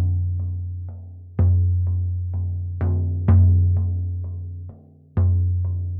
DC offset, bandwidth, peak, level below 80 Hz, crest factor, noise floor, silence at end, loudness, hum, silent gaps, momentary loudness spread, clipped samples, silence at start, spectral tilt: under 0.1%; 2.1 kHz; -6 dBFS; -40 dBFS; 14 dB; -43 dBFS; 0 s; -22 LUFS; none; none; 16 LU; under 0.1%; 0 s; -14 dB/octave